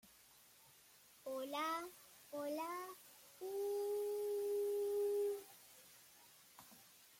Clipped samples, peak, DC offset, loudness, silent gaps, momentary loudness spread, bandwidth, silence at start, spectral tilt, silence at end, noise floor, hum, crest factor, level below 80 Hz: under 0.1%; -32 dBFS; under 0.1%; -43 LUFS; none; 24 LU; 16.5 kHz; 0.05 s; -2.5 dB/octave; 0 s; -67 dBFS; none; 12 dB; -90 dBFS